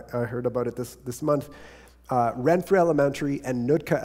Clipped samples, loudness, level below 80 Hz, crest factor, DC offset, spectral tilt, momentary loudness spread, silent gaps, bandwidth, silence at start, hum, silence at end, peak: under 0.1%; -25 LUFS; -54 dBFS; 18 dB; under 0.1%; -7 dB/octave; 10 LU; none; 16 kHz; 0 s; none; 0 s; -8 dBFS